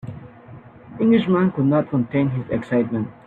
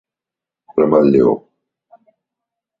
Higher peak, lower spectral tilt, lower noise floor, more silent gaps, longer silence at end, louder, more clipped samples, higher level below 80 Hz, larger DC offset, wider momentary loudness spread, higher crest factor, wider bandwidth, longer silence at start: second, -6 dBFS vs -2 dBFS; about the same, -10 dB/octave vs -10.5 dB/octave; second, -42 dBFS vs -87 dBFS; neither; second, 0.15 s vs 1.4 s; second, -20 LUFS vs -14 LUFS; neither; about the same, -54 dBFS vs -56 dBFS; neither; first, 15 LU vs 12 LU; about the same, 16 dB vs 16 dB; second, 4.3 kHz vs 5.4 kHz; second, 0.05 s vs 0.75 s